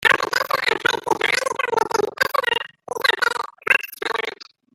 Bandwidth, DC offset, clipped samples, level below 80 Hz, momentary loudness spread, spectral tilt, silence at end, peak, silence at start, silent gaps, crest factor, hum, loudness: 17 kHz; under 0.1%; under 0.1%; -62 dBFS; 7 LU; -1.5 dB/octave; 0.3 s; 0 dBFS; 0 s; none; 20 dB; none; -20 LUFS